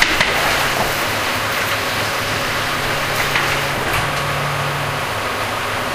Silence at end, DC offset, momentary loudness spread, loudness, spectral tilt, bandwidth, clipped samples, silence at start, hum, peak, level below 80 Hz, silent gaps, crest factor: 0 s; under 0.1%; 5 LU; -18 LUFS; -3 dB/octave; 16 kHz; under 0.1%; 0 s; none; 0 dBFS; -38 dBFS; none; 18 dB